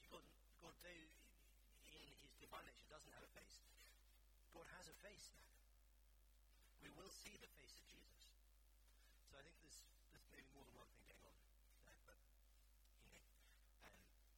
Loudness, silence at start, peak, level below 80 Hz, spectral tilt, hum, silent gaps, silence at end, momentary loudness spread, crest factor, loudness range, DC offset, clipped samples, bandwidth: -65 LUFS; 0 s; -44 dBFS; -74 dBFS; -2.5 dB/octave; none; none; 0 s; 8 LU; 24 dB; 4 LU; under 0.1%; under 0.1%; 18 kHz